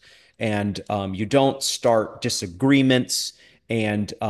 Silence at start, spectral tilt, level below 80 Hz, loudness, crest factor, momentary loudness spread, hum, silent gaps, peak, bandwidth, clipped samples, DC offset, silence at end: 0.4 s; -4.5 dB/octave; -52 dBFS; -22 LUFS; 18 dB; 9 LU; none; none; -4 dBFS; 12.5 kHz; under 0.1%; under 0.1%; 0 s